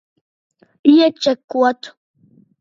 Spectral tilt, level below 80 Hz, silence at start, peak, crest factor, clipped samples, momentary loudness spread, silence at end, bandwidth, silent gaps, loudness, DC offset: -4 dB/octave; -70 dBFS; 0.85 s; 0 dBFS; 18 dB; under 0.1%; 15 LU; 0.7 s; 7.4 kHz; 1.44-1.48 s; -15 LUFS; under 0.1%